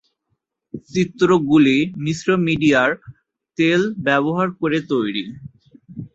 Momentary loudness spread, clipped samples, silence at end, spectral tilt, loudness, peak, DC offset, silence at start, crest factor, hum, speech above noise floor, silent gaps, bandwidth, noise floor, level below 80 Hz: 20 LU; under 0.1%; 0.1 s; -6 dB/octave; -18 LUFS; -2 dBFS; under 0.1%; 0.75 s; 16 dB; none; 55 dB; none; 8 kHz; -73 dBFS; -54 dBFS